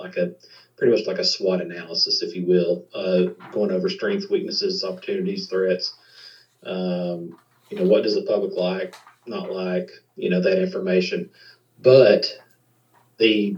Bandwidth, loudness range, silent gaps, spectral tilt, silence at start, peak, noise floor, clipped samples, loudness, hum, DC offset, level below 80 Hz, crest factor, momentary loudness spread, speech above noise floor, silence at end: 7.8 kHz; 5 LU; none; -5.5 dB/octave; 0 s; -2 dBFS; -61 dBFS; under 0.1%; -22 LUFS; none; under 0.1%; -88 dBFS; 20 dB; 11 LU; 39 dB; 0 s